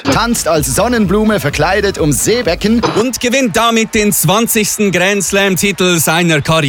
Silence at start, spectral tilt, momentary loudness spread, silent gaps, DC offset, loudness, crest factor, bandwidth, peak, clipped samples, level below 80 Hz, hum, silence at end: 0 s; -4 dB/octave; 2 LU; none; under 0.1%; -11 LUFS; 10 dB; 19.5 kHz; -2 dBFS; under 0.1%; -32 dBFS; none; 0 s